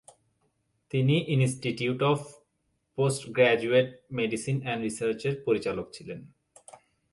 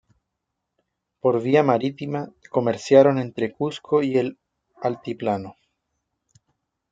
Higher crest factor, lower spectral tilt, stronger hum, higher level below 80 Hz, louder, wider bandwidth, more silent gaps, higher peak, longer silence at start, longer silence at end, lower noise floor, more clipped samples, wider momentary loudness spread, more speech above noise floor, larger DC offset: about the same, 20 dB vs 22 dB; about the same, -6 dB/octave vs -7 dB/octave; neither; about the same, -66 dBFS vs -68 dBFS; second, -27 LUFS vs -22 LUFS; first, 11.5 kHz vs 7.8 kHz; neither; second, -8 dBFS vs -2 dBFS; second, 0.95 s vs 1.25 s; second, 0.85 s vs 1.4 s; second, -76 dBFS vs -81 dBFS; neither; about the same, 16 LU vs 14 LU; second, 49 dB vs 60 dB; neither